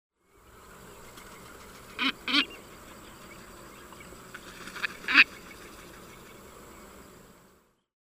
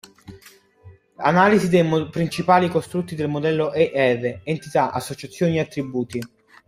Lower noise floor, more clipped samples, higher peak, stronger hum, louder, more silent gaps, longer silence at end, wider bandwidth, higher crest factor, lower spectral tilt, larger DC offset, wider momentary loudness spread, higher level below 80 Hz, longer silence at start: first, -63 dBFS vs -50 dBFS; neither; about the same, -4 dBFS vs -2 dBFS; neither; second, -25 LUFS vs -21 LUFS; neither; first, 2.35 s vs 0.4 s; about the same, 16 kHz vs 15.5 kHz; first, 30 dB vs 20 dB; second, -2 dB/octave vs -6.5 dB/octave; neither; first, 26 LU vs 12 LU; about the same, -60 dBFS vs -58 dBFS; first, 1.9 s vs 0.3 s